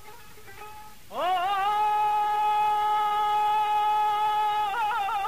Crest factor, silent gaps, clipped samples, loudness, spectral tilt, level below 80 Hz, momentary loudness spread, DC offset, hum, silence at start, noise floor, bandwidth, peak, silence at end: 8 dB; none; under 0.1%; -25 LUFS; -2 dB/octave; -60 dBFS; 12 LU; 0.5%; none; 0.05 s; -48 dBFS; 15.5 kHz; -18 dBFS; 0 s